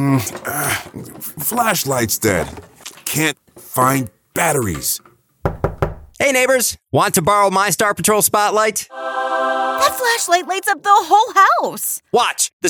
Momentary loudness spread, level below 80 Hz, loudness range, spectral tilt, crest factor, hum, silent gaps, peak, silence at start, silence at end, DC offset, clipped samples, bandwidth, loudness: 11 LU; -42 dBFS; 5 LU; -3 dB/octave; 16 dB; none; 12.53-12.60 s; 0 dBFS; 0 s; 0 s; under 0.1%; under 0.1%; over 20 kHz; -16 LUFS